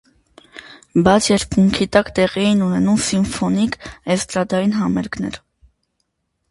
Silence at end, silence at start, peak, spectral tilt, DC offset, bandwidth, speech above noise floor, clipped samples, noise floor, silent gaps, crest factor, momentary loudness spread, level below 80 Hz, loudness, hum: 1.15 s; 0.55 s; 0 dBFS; -5 dB/octave; under 0.1%; 11.5 kHz; 55 dB; under 0.1%; -71 dBFS; none; 18 dB; 13 LU; -42 dBFS; -17 LUFS; none